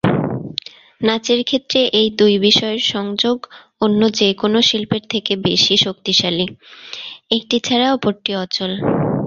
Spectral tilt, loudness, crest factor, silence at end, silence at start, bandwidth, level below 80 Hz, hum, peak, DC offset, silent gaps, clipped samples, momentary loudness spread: -4.5 dB/octave; -16 LUFS; 18 dB; 0 s; 0.05 s; 7.4 kHz; -52 dBFS; none; 0 dBFS; under 0.1%; none; under 0.1%; 11 LU